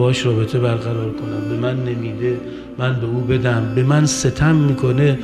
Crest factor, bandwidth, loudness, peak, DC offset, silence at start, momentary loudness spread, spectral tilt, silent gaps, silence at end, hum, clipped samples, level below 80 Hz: 14 dB; 12 kHz; -18 LUFS; -2 dBFS; under 0.1%; 0 s; 8 LU; -6 dB/octave; none; 0 s; none; under 0.1%; -40 dBFS